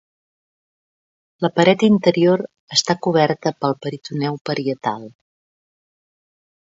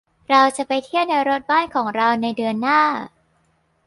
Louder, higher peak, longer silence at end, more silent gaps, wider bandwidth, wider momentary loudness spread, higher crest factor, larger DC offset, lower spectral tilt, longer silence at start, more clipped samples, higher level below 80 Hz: about the same, -19 LUFS vs -19 LUFS; about the same, 0 dBFS vs -2 dBFS; first, 1.6 s vs 0.8 s; first, 2.60-2.68 s, 4.41-4.45 s vs none; second, 7.8 kHz vs 11.5 kHz; first, 10 LU vs 7 LU; about the same, 20 dB vs 18 dB; neither; about the same, -5 dB/octave vs -4 dB/octave; first, 1.4 s vs 0.3 s; neither; about the same, -64 dBFS vs -64 dBFS